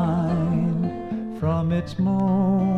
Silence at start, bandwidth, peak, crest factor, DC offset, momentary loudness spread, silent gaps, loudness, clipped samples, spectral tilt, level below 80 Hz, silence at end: 0 s; 6.2 kHz; -12 dBFS; 10 dB; under 0.1%; 7 LU; none; -23 LUFS; under 0.1%; -9.5 dB/octave; -46 dBFS; 0 s